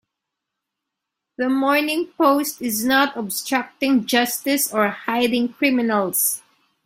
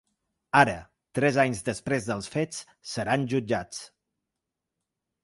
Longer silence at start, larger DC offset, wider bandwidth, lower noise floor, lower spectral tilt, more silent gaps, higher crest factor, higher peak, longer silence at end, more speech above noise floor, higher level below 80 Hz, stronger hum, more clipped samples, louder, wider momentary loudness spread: first, 1.4 s vs 0.55 s; neither; first, 16.5 kHz vs 11.5 kHz; second, -82 dBFS vs -86 dBFS; second, -2.5 dB/octave vs -5 dB/octave; neither; second, 18 dB vs 24 dB; about the same, -4 dBFS vs -4 dBFS; second, 0.45 s vs 1.35 s; about the same, 62 dB vs 59 dB; second, -64 dBFS vs -58 dBFS; neither; neither; first, -20 LUFS vs -27 LUFS; second, 5 LU vs 16 LU